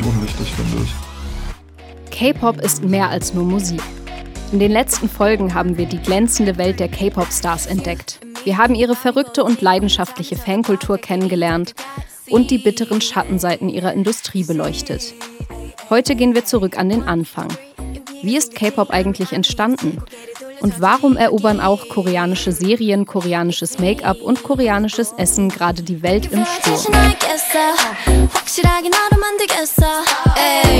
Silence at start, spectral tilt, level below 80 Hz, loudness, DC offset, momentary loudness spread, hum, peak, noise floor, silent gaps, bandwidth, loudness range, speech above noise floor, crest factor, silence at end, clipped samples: 0 s; -4.5 dB/octave; -28 dBFS; -17 LUFS; under 0.1%; 13 LU; none; 0 dBFS; -38 dBFS; none; 19 kHz; 5 LU; 22 dB; 16 dB; 0 s; under 0.1%